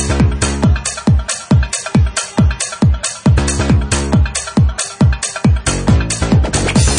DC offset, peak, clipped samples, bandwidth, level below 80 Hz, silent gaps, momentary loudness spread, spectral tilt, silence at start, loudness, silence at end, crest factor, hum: under 0.1%; 0 dBFS; under 0.1%; 10.5 kHz; -20 dBFS; none; 2 LU; -5 dB/octave; 0 s; -14 LUFS; 0 s; 12 dB; none